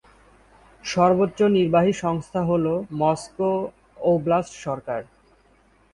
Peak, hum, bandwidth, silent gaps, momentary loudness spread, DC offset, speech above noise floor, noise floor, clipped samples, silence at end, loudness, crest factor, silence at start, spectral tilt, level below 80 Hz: -4 dBFS; none; 11.5 kHz; none; 12 LU; under 0.1%; 37 dB; -58 dBFS; under 0.1%; 0.9 s; -22 LUFS; 18 dB; 0.85 s; -6.5 dB/octave; -54 dBFS